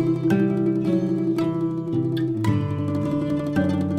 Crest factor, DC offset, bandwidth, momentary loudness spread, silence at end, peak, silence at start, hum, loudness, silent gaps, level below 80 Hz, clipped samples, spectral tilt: 14 dB; under 0.1%; 11 kHz; 4 LU; 0 s; -8 dBFS; 0 s; none; -23 LUFS; none; -52 dBFS; under 0.1%; -8.5 dB/octave